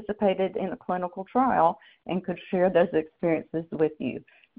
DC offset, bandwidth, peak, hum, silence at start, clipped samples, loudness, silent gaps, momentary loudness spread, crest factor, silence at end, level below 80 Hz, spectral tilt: under 0.1%; 4.5 kHz; -10 dBFS; none; 0 s; under 0.1%; -27 LUFS; none; 11 LU; 18 dB; 0.4 s; -62 dBFS; -5.5 dB/octave